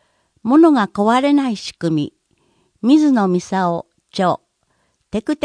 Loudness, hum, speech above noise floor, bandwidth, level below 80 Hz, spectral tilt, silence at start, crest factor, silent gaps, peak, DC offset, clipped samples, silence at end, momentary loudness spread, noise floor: -16 LUFS; none; 50 dB; 10.5 kHz; -56 dBFS; -6.5 dB/octave; 0.45 s; 16 dB; none; -2 dBFS; under 0.1%; under 0.1%; 0.1 s; 14 LU; -65 dBFS